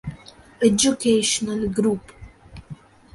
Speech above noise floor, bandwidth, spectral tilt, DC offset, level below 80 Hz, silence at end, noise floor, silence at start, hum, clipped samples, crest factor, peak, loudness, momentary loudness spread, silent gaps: 25 dB; 12 kHz; -3.5 dB/octave; under 0.1%; -48 dBFS; 0.4 s; -45 dBFS; 0.05 s; none; under 0.1%; 20 dB; -4 dBFS; -20 LUFS; 20 LU; none